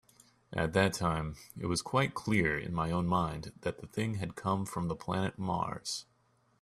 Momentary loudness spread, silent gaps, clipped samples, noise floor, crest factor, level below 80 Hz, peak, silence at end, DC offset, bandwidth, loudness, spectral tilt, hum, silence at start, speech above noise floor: 9 LU; none; under 0.1%; -71 dBFS; 20 dB; -56 dBFS; -14 dBFS; 0.6 s; under 0.1%; 14 kHz; -34 LUFS; -5.5 dB/octave; none; 0.5 s; 38 dB